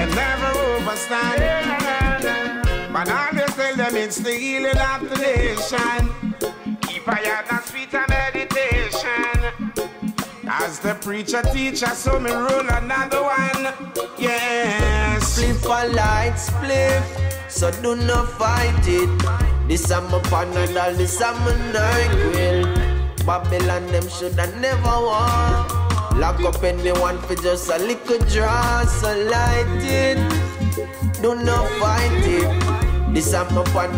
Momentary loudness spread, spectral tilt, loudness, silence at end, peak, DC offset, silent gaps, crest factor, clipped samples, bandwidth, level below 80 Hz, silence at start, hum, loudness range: 6 LU; -5 dB/octave; -20 LUFS; 0 s; -6 dBFS; under 0.1%; none; 14 dB; under 0.1%; 16.5 kHz; -26 dBFS; 0 s; none; 3 LU